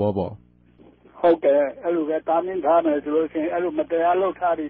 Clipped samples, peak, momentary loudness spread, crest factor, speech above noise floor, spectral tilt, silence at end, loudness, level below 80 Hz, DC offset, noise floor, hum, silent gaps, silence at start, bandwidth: under 0.1%; -8 dBFS; 6 LU; 14 dB; 31 dB; -11.5 dB/octave; 0 s; -22 LUFS; -54 dBFS; under 0.1%; -52 dBFS; 60 Hz at -55 dBFS; none; 0 s; 4.5 kHz